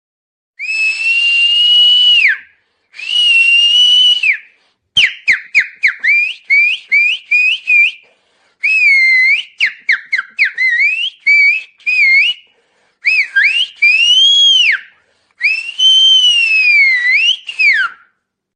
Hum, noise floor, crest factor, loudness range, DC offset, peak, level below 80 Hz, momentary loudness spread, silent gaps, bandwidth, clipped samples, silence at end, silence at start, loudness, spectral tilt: none; -62 dBFS; 12 dB; 3 LU; under 0.1%; 0 dBFS; -66 dBFS; 9 LU; none; 10 kHz; under 0.1%; 0.65 s; 0.6 s; -8 LUFS; 4 dB/octave